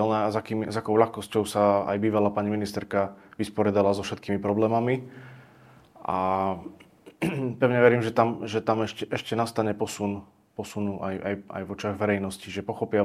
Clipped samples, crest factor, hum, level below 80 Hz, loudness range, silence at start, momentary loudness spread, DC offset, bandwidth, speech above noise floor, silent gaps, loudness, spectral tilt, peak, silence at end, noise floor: under 0.1%; 22 dB; none; -64 dBFS; 5 LU; 0 s; 11 LU; under 0.1%; 15 kHz; 28 dB; none; -26 LUFS; -6.5 dB/octave; -4 dBFS; 0 s; -54 dBFS